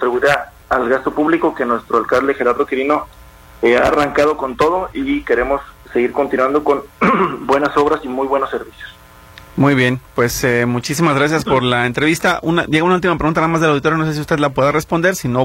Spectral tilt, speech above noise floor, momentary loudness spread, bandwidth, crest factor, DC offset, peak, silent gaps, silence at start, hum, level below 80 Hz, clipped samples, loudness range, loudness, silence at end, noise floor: -5.5 dB/octave; 25 dB; 6 LU; 16.5 kHz; 16 dB; under 0.1%; 0 dBFS; none; 0 s; none; -42 dBFS; under 0.1%; 2 LU; -16 LUFS; 0 s; -40 dBFS